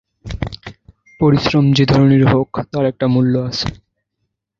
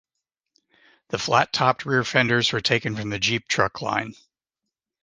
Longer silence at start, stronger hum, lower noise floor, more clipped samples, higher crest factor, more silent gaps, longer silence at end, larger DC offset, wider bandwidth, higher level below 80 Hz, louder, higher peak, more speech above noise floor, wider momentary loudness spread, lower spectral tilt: second, 0.25 s vs 1.1 s; neither; second, -73 dBFS vs -85 dBFS; neither; second, 16 dB vs 24 dB; neither; about the same, 0.85 s vs 0.9 s; neither; second, 7.2 kHz vs 10 kHz; first, -38 dBFS vs -58 dBFS; first, -15 LUFS vs -22 LUFS; about the same, 0 dBFS vs 0 dBFS; about the same, 60 dB vs 62 dB; first, 15 LU vs 8 LU; first, -7.5 dB/octave vs -4 dB/octave